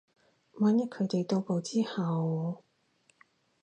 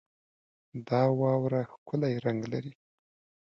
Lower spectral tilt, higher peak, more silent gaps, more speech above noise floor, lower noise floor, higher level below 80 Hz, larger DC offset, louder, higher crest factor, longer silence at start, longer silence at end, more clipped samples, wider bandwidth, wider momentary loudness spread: second, -7 dB/octave vs -9 dB/octave; about the same, -16 dBFS vs -14 dBFS; second, none vs 1.78-1.86 s; second, 40 dB vs over 61 dB; second, -70 dBFS vs under -90 dBFS; second, -80 dBFS vs -70 dBFS; neither; about the same, -31 LUFS vs -30 LUFS; about the same, 16 dB vs 18 dB; second, 0.55 s vs 0.75 s; first, 1.05 s vs 0.75 s; neither; first, 9.6 kHz vs 6.8 kHz; second, 7 LU vs 17 LU